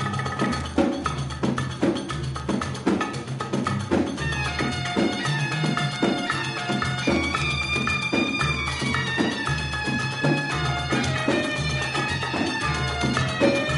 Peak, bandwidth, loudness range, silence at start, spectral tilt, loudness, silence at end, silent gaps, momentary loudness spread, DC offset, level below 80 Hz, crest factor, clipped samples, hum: -8 dBFS; 11.5 kHz; 3 LU; 0 s; -5 dB/octave; -24 LUFS; 0 s; none; 4 LU; under 0.1%; -42 dBFS; 16 dB; under 0.1%; none